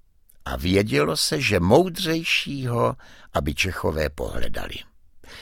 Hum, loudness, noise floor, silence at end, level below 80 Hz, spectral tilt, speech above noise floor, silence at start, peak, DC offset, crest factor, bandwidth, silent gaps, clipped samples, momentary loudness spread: none; -23 LUFS; -45 dBFS; 0 s; -38 dBFS; -4.5 dB/octave; 23 dB; 0.45 s; -4 dBFS; under 0.1%; 20 dB; 17 kHz; none; under 0.1%; 15 LU